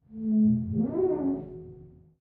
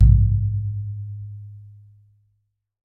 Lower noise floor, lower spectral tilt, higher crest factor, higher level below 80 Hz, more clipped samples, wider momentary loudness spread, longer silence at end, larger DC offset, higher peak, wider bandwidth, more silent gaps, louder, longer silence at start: second, -50 dBFS vs -72 dBFS; first, -14 dB/octave vs -12.5 dB/octave; second, 12 dB vs 18 dB; second, -56 dBFS vs -24 dBFS; neither; second, 20 LU vs 23 LU; second, 0.35 s vs 1.2 s; neither; second, -16 dBFS vs -2 dBFS; first, 2.1 kHz vs 0.8 kHz; neither; second, -27 LUFS vs -22 LUFS; about the same, 0.1 s vs 0 s